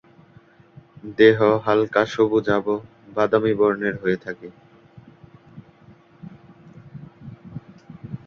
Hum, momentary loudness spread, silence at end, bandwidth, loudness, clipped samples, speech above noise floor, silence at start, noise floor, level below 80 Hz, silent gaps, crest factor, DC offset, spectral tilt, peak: none; 26 LU; 0.1 s; 6.8 kHz; -20 LUFS; under 0.1%; 32 dB; 1.05 s; -52 dBFS; -58 dBFS; none; 20 dB; under 0.1%; -7 dB/octave; -2 dBFS